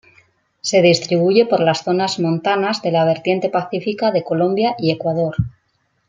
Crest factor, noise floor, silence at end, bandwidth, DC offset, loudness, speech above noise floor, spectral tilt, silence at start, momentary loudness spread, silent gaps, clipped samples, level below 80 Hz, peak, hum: 16 dB; -65 dBFS; 0.6 s; 9.4 kHz; under 0.1%; -17 LUFS; 49 dB; -5.5 dB/octave; 0.65 s; 7 LU; none; under 0.1%; -50 dBFS; -2 dBFS; none